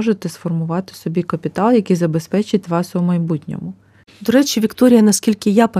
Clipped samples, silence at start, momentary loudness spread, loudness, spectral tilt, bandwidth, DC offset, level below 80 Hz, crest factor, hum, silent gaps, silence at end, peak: under 0.1%; 0 s; 11 LU; -17 LUFS; -6 dB/octave; 15.5 kHz; under 0.1%; -58 dBFS; 16 dB; none; none; 0 s; 0 dBFS